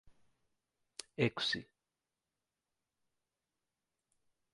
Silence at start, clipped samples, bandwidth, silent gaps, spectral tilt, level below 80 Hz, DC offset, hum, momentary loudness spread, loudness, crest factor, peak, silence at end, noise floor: 0.05 s; under 0.1%; 11 kHz; none; -4.5 dB/octave; -76 dBFS; under 0.1%; none; 18 LU; -36 LUFS; 28 dB; -16 dBFS; 2.9 s; under -90 dBFS